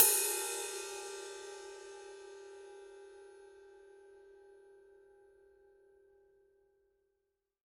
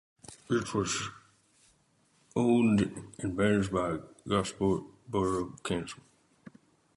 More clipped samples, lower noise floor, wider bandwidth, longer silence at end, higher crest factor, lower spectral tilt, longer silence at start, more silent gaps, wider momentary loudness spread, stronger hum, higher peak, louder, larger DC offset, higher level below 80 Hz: neither; first, -85 dBFS vs -69 dBFS; first, 14 kHz vs 11.5 kHz; first, 2.95 s vs 1.05 s; first, 32 dB vs 18 dB; second, 1.5 dB/octave vs -5.5 dB/octave; second, 0 s vs 0.3 s; neither; first, 25 LU vs 13 LU; neither; first, -8 dBFS vs -14 dBFS; second, -36 LUFS vs -31 LUFS; neither; second, -82 dBFS vs -56 dBFS